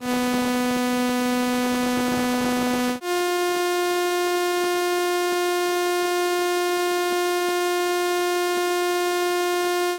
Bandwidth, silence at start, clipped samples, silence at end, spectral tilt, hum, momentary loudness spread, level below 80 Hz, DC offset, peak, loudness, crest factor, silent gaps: 17 kHz; 0 s; under 0.1%; 0 s; -2.5 dB/octave; none; 0 LU; -58 dBFS; under 0.1%; -12 dBFS; -22 LUFS; 10 dB; none